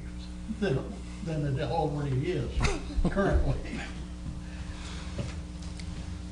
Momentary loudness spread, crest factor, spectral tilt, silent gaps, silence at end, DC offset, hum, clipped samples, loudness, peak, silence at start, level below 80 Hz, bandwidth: 12 LU; 20 dB; -6.5 dB/octave; none; 0 s; under 0.1%; none; under 0.1%; -33 LUFS; -12 dBFS; 0 s; -36 dBFS; 10.5 kHz